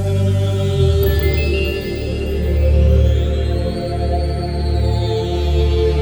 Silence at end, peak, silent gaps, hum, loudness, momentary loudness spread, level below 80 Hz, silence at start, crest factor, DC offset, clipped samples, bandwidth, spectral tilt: 0 s; -4 dBFS; none; none; -17 LUFS; 6 LU; -18 dBFS; 0 s; 12 dB; under 0.1%; under 0.1%; over 20 kHz; -7.5 dB/octave